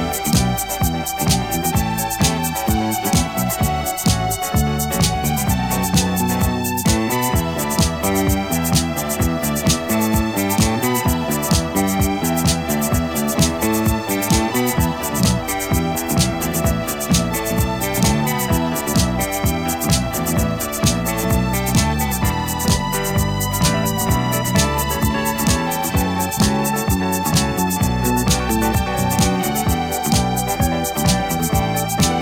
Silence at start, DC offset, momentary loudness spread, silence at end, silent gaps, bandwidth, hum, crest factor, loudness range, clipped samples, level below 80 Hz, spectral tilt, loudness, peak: 0 s; under 0.1%; 3 LU; 0 s; none; 19.5 kHz; none; 14 dB; 1 LU; under 0.1%; -28 dBFS; -4.5 dB/octave; -18 LUFS; -4 dBFS